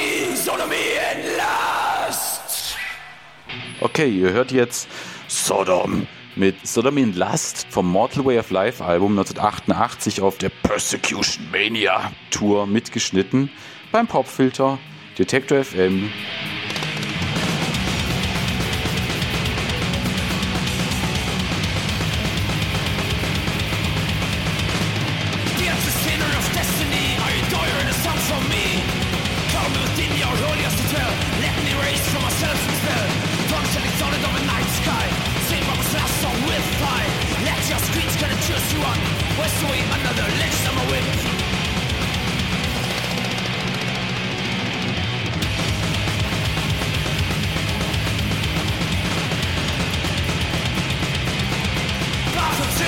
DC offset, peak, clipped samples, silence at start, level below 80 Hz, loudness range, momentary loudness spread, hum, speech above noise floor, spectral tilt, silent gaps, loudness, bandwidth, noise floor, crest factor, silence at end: 0.3%; -2 dBFS; under 0.1%; 0 s; -34 dBFS; 2 LU; 4 LU; none; 21 dB; -4 dB/octave; none; -21 LUFS; 17 kHz; -41 dBFS; 20 dB; 0 s